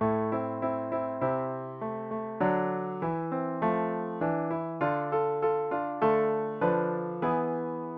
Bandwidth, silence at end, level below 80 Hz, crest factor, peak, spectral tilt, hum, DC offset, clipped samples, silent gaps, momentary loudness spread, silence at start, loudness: 5 kHz; 0 s; -66 dBFS; 16 dB; -12 dBFS; -10.5 dB/octave; none; under 0.1%; under 0.1%; none; 6 LU; 0 s; -30 LUFS